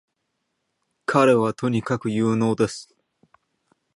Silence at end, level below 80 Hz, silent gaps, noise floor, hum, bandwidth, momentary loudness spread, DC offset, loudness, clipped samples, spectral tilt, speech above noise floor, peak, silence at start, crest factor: 1.15 s; -62 dBFS; none; -76 dBFS; none; 11.5 kHz; 8 LU; under 0.1%; -21 LUFS; under 0.1%; -6.5 dB/octave; 56 dB; -4 dBFS; 1.1 s; 20 dB